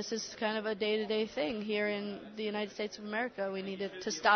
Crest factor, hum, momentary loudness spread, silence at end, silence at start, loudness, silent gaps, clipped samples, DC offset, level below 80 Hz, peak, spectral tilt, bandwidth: 20 dB; none; 6 LU; 0 s; 0 s; -35 LUFS; none; under 0.1%; under 0.1%; -72 dBFS; -14 dBFS; -3.5 dB/octave; 6.6 kHz